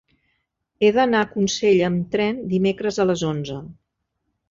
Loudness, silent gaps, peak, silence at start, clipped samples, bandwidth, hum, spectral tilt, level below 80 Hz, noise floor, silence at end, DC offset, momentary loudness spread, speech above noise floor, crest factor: -20 LUFS; none; -6 dBFS; 0.8 s; under 0.1%; 7.6 kHz; none; -5.5 dB/octave; -56 dBFS; -76 dBFS; 0.75 s; under 0.1%; 8 LU; 56 dB; 16 dB